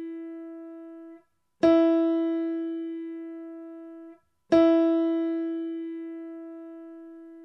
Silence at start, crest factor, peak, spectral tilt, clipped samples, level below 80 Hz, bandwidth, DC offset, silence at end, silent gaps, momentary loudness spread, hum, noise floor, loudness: 0 s; 18 dB; -10 dBFS; -7 dB/octave; under 0.1%; -68 dBFS; 6 kHz; under 0.1%; 0 s; none; 23 LU; none; -56 dBFS; -25 LUFS